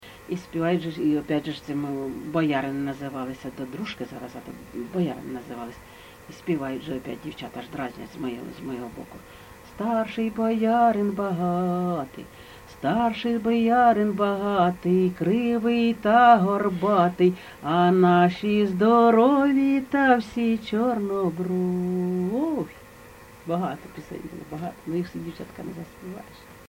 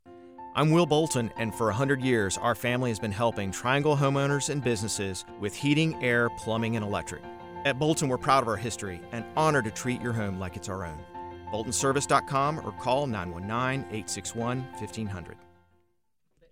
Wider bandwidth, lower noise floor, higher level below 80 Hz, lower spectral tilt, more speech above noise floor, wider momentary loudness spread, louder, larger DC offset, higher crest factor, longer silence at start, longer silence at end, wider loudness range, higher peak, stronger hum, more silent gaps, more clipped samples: about the same, 17 kHz vs 18.5 kHz; second, -47 dBFS vs -77 dBFS; about the same, -56 dBFS vs -58 dBFS; first, -7.5 dB/octave vs -5 dB/octave; second, 23 dB vs 50 dB; first, 19 LU vs 12 LU; first, -23 LUFS vs -28 LUFS; second, under 0.1% vs 0.1%; about the same, 20 dB vs 20 dB; about the same, 0.05 s vs 0.05 s; second, 0.05 s vs 1.15 s; first, 13 LU vs 4 LU; first, -4 dBFS vs -8 dBFS; neither; neither; neither